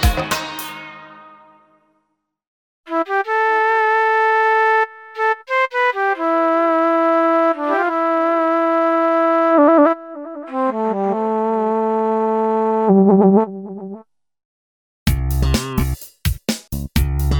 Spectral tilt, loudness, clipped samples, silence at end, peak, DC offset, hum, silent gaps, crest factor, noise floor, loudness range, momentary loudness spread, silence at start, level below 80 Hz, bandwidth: -6 dB/octave; -17 LUFS; under 0.1%; 0 s; 0 dBFS; under 0.1%; none; 2.47-2.84 s, 14.45-15.06 s; 16 dB; -71 dBFS; 7 LU; 12 LU; 0 s; -30 dBFS; over 20 kHz